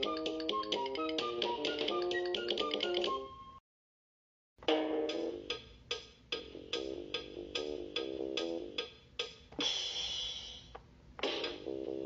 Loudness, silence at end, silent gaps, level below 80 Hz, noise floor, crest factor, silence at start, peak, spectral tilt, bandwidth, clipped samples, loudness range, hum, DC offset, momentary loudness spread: -37 LUFS; 0 s; 3.60-4.56 s; -64 dBFS; under -90 dBFS; 22 dB; 0 s; -18 dBFS; -1 dB/octave; 7.8 kHz; under 0.1%; 5 LU; none; under 0.1%; 9 LU